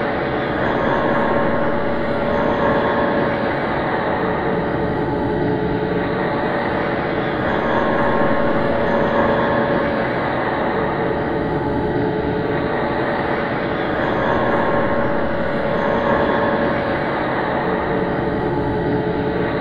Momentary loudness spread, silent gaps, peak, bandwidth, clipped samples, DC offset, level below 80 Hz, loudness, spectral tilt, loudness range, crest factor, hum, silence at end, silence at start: 3 LU; none; -4 dBFS; 6.8 kHz; under 0.1%; under 0.1%; -38 dBFS; -19 LUFS; -8.5 dB/octave; 2 LU; 14 dB; none; 0 s; 0 s